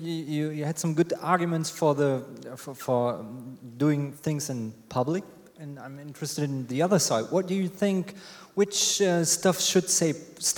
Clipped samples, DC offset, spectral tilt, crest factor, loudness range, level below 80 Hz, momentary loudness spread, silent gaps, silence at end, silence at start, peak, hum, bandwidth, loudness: under 0.1%; under 0.1%; -4 dB/octave; 20 dB; 6 LU; -70 dBFS; 18 LU; none; 0 s; 0 s; -8 dBFS; none; 20 kHz; -26 LUFS